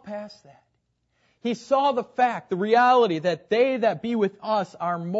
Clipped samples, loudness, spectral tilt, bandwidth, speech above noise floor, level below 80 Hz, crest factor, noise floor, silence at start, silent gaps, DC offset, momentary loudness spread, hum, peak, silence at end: under 0.1%; -23 LUFS; -6 dB/octave; 8 kHz; 49 dB; -74 dBFS; 16 dB; -72 dBFS; 0.05 s; none; under 0.1%; 12 LU; none; -8 dBFS; 0 s